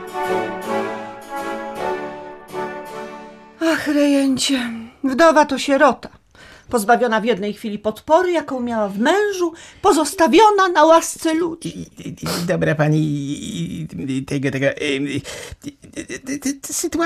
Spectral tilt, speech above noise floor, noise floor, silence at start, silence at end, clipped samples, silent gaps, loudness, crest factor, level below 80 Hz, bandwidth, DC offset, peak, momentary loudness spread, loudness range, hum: -4.5 dB/octave; 28 dB; -45 dBFS; 0 s; 0 s; under 0.1%; none; -18 LUFS; 16 dB; -52 dBFS; 14.5 kHz; under 0.1%; -2 dBFS; 18 LU; 8 LU; none